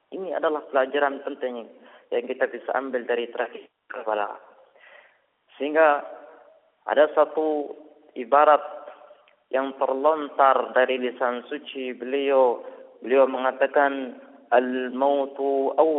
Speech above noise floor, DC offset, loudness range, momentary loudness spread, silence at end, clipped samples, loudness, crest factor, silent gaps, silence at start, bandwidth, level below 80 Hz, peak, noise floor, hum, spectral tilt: 38 dB; under 0.1%; 7 LU; 16 LU; 0 s; under 0.1%; -24 LUFS; 20 dB; none; 0.1 s; 4 kHz; -76 dBFS; -4 dBFS; -61 dBFS; none; -0.5 dB/octave